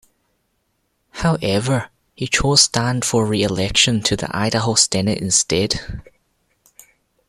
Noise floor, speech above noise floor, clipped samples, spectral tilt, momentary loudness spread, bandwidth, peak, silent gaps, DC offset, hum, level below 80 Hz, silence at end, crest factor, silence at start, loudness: -68 dBFS; 50 dB; under 0.1%; -3 dB/octave; 10 LU; 16 kHz; 0 dBFS; none; under 0.1%; none; -40 dBFS; 1.25 s; 20 dB; 1.15 s; -17 LUFS